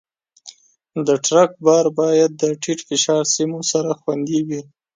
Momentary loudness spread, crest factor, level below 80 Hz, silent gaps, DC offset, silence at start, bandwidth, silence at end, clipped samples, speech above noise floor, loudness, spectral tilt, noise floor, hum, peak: 9 LU; 16 dB; -68 dBFS; none; under 0.1%; 0.45 s; 9.6 kHz; 0.35 s; under 0.1%; 27 dB; -18 LUFS; -4 dB/octave; -45 dBFS; none; -2 dBFS